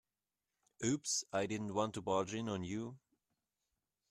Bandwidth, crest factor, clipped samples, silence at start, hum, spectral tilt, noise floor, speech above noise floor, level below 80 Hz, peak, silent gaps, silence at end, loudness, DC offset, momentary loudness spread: 13.5 kHz; 20 dB; under 0.1%; 0.8 s; none; -4 dB/octave; under -90 dBFS; over 51 dB; -74 dBFS; -20 dBFS; none; 1.15 s; -39 LUFS; under 0.1%; 6 LU